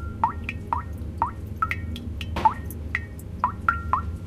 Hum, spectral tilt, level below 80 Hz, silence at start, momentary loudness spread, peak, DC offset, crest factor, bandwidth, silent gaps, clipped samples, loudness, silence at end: none; -6 dB/octave; -36 dBFS; 0 s; 9 LU; -6 dBFS; under 0.1%; 22 dB; 16 kHz; none; under 0.1%; -28 LUFS; 0 s